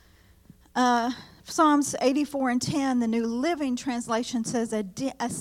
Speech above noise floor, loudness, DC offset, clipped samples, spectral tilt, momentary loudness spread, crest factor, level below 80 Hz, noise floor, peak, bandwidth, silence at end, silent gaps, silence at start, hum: 31 dB; -26 LUFS; under 0.1%; under 0.1%; -4 dB/octave; 9 LU; 16 dB; -62 dBFS; -56 dBFS; -10 dBFS; 15 kHz; 0 s; none; 0.75 s; none